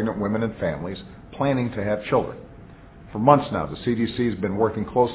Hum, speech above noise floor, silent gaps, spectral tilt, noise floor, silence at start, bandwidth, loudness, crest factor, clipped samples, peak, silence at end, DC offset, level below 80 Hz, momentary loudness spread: none; 21 dB; none; -11.5 dB/octave; -44 dBFS; 0 s; 4 kHz; -24 LUFS; 22 dB; under 0.1%; -2 dBFS; 0 s; under 0.1%; -46 dBFS; 16 LU